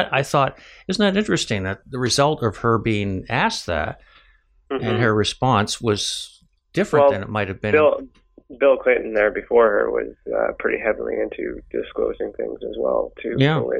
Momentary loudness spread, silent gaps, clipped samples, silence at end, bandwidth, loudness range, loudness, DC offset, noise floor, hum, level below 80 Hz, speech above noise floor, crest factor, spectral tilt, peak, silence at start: 11 LU; none; under 0.1%; 0 s; 14 kHz; 4 LU; -21 LUFS; under 0.1%; -56 dBFS; none; -46 dBFS; 36 dB; 16 dB; -5 dB/octave; -4 dBFS; 0 s